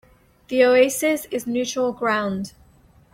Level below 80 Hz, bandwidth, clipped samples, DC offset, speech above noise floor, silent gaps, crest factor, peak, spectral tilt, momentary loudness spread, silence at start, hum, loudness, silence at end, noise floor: -58 dBFS; 16.5 kHz; under 0.1%; under 0.1%; 33 dB; none; 16 dB; -6 dBFS; -4 dB/octave; 11 LU; 0.5 s; none; -21 LUFS; 0.65 s; -54 dBFS